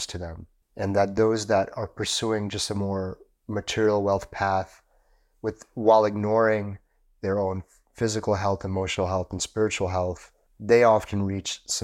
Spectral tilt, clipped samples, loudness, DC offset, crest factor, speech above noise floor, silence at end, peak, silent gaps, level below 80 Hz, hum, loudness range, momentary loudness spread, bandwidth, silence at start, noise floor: -4.5 dB/octave; under 0.1%; -25 LUFS; under 0.1%; 20 dB; 38 dB; 0 s; -6 dBFS; none; -54 dBFS; none; 3 LU; 14 LU; 14 kHz; 0 s; -63 dBFS